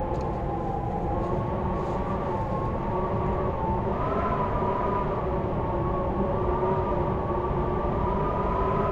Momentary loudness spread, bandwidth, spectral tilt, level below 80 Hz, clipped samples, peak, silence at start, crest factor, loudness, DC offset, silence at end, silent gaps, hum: 3 LU; 7.4 kHz; -9.5 dB/octave; -34 dBFS; under 0.1%; -14 dBFS; 0 s; 14 dB; -28 LUFS; under 0.1%; 0 s; none; none